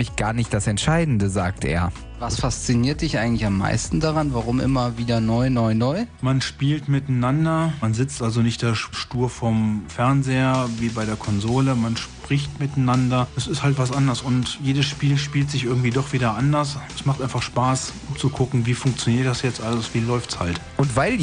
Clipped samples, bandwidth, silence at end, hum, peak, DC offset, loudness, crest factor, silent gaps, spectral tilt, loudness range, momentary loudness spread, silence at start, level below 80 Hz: under 0.1%; 10 kHz; 0 s; none; -6 dBFS; under 0.1%; -22 LUFS; 16 dB; none; -5.5 dB/octave; 1 LU; 5 LU; 0 s; -40 dBFS